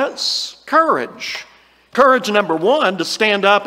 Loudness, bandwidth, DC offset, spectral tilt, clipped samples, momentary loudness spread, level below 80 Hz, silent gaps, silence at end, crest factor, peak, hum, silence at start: -16 LUFS; 16 kHz; under 0.1%; -3 dB/octave; under 0.1%; 12 LU; -64 dBFS; none; 0 s; 16 dB; 0 dBFS; none; 0 s